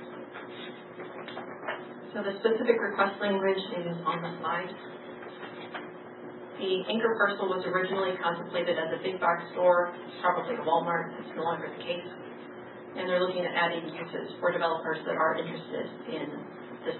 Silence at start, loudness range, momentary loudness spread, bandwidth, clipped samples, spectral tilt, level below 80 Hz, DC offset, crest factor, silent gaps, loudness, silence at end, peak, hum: 0 s; 4 LU; 16 LU; 4.3 kHz; under 0.1%; -9 dB/octave; -84 dBFS; under 0.1%; 22 dB; none; -30 LUFS; 0 s; -8 dBFS; none